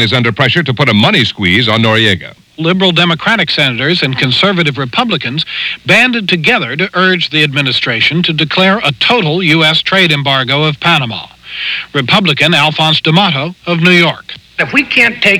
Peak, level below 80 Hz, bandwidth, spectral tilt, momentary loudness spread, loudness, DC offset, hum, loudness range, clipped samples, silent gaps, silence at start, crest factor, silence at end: 0 dBFS; -48 dBFS; 17.5 kHz; -5 dB/octave; 8 LU; -9 LUFS; under 0.1%; none; 1 LU; 0.7%; none; 0 s; 10 dB; 0 s